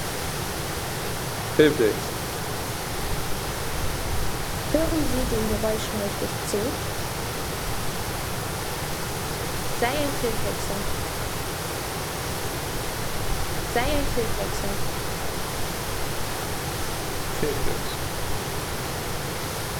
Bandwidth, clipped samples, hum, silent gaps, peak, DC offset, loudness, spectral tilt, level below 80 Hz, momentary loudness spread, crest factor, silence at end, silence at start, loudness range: over 20 kHz; under 0.1%; none; none; -4 dBFS; under 0.1%; -27 LUFS; -4 dB/octave; -36 dBFS; 5 LU; 22 dB; 0 s; 0 s; 3 LU